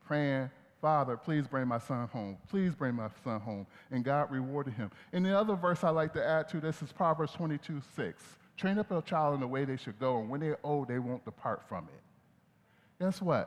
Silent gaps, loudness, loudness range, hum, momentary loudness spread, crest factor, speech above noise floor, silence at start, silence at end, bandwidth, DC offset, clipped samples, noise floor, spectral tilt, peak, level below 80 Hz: none; -34 LUFS; 4 LU; none; 10 LU; 18 dB; 34 dB; 0.05 s; 0 s; 12.5 kHz; under 0.1%; under 0.1%; -67 dBFS; -7.5 dB/octave; -16 dBFS; -72 dBFS